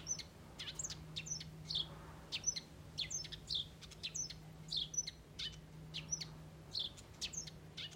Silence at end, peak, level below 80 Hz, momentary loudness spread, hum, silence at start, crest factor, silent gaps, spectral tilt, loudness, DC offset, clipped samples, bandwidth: 0 s; -26 dBFS; -62 dBFS; 9 LU; none; 0 s; 20 dB; none; -1 dB/octave; -43 LUFS; under 0.1%; under 0.1%; 16 kHz